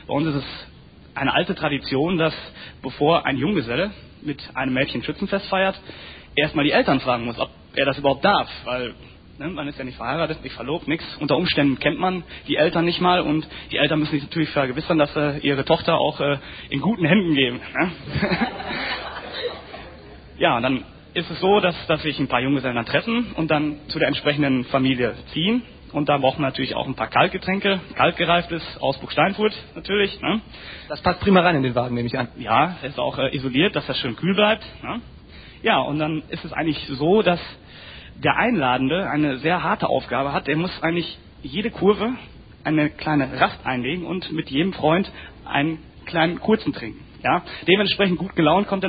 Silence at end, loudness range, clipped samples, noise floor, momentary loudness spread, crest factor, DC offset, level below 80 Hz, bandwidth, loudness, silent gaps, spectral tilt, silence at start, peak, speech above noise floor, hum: 0 s; 3 LU; under 0.1%; -42 dBFS; 12 LU; 20 dB; under 0.1%; -46 dBFS; 5 kHz; -22 LUFS; none; -10.5 dB/octave; 0.1 s; -2 dBFS; 20 dB; none